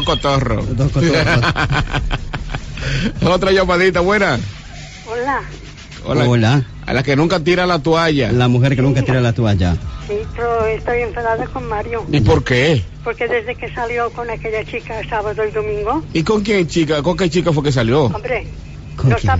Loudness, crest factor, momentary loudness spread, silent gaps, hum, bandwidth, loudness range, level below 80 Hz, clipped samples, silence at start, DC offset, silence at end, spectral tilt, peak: -16 LUFS; 12 dB; 11 LU; none; none; 8 kHz; 4 LU; -30 dBFS; under 0.1%; 0 s; under 0.1%; 0 s; -6.5 dB/octave; -4 dBFS